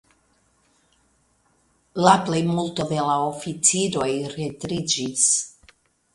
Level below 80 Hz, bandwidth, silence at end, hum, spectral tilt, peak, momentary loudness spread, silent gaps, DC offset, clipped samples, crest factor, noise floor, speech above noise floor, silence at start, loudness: -58 dBFS; 11.5 kHz; 0.65 s; none; -3.5 dB/octave; -2 dBFS; 11 LU; none; under 0.1%; under 0.1%; 24 dB; -64 dBFS; 42 dB; 1.95 s; -21 LUFS